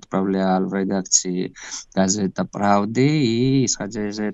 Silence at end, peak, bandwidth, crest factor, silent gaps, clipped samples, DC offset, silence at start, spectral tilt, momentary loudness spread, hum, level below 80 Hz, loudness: 0 s; -2 dBFS; 8.2 kHz; 18 dB; none; under 0.1%; under 0.1%; 0.1 s; -4.5 dB/octave; 9 LU; none; -54 dBFS; -20 LUFS